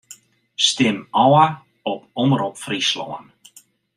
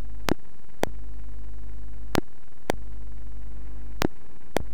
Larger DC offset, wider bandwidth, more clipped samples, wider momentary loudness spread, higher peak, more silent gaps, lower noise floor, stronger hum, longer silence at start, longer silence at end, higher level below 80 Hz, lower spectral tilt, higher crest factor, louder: second, under 0.1% vs 8%; second, 14.5 kHz vs over 20 kHz; neither; first, 16 LU vs 12 LU; about the same, -2 dBFS vs -4 dBFS; neither; about the same, -51 dBFS vs -52 dBFS; neither; about the same, 0.1 s vs 0 s; first, 0.75 s vs 0 s; second, -64 dBFS vs -40 dBFS; about the same, -4 dB/octave vs -5 dB/octave; second, 18 dB vs 30 dB; first, -19 LUFS vs -34 LUFS